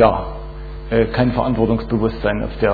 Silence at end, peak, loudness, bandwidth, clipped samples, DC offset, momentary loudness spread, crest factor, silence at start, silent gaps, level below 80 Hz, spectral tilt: 0 s; -2 dBFS; -19 LUFS; 4.9 kHz; under 0.1%; under 0.1%; 15 LU; 16 dB; 0 s; none; -30 dBFS; -10 dB/octave